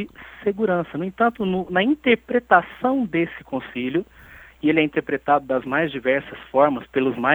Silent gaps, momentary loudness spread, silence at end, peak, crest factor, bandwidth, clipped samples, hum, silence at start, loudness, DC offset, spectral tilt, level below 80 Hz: none; 9 LU; 0 s; 0 dBFS; 20 dB; over 20 kHz; under 0.1%; none; 0 s; -22 LUFS; under 0.1%; -8 dB/octave; -54 dBFS